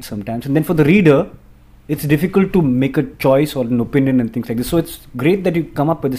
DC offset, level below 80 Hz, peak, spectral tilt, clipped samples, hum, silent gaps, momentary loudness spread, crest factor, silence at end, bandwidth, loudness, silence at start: under 0.1%; -42 dBFS; 0 dBFS; -7.5 dB/octave; under 0.1%; none; none; 10 LU; 16 dB; 0 s; 16 kHz; -16 LUFS; 0 s